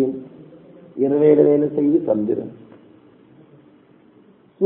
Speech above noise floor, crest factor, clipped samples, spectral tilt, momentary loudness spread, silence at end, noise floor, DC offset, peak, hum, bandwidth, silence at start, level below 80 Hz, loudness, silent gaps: 35 dB; 20 dB; under 0.1%; -13 dB/octave; 21 LU; 0 s; -52 dBFS; under 0.1%; -2 dBFS; none; 3.7 kHz; 0 s; -64 dBFS; -18 LUFS; none